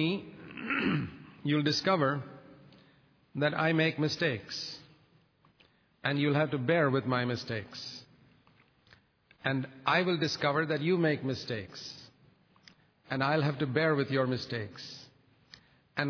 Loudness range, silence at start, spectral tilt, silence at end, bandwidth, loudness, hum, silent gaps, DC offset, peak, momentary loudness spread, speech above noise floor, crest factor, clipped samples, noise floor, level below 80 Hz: 2 LU; 0 s; -6 dB/octave; 0 s; 5.4 kHz; -31 LUFS; none; none; under 0.1%; -12 dBFS; 15 LU; 36 dB; 22 dB; under 0.1%; -66 dBFS; -70 dBFS